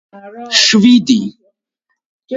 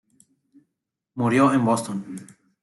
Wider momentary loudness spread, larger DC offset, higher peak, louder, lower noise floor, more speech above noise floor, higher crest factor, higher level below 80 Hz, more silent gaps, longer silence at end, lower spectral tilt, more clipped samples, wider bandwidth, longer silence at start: second, 18 LU vs 21 LU; neither; first, 0 dBFS vs -6 dBFS; first, -10 LUFS vs -22 LUFS; second, -71 dBFS vs -82 dBFS; about the same, 60 dB vs 60 dB; about the same, 14 dB vs 18 dB; first, -58 dBFS vs -68 dBFS; first, 2.06-2.19 s vs none; second, 0 s vs 0.4 s; second, -3 dB/octave vs -6.5 dB/octave; neither; second, 7.8 kHz vs 12 kHz; second, 0.15 s vs 1.15 s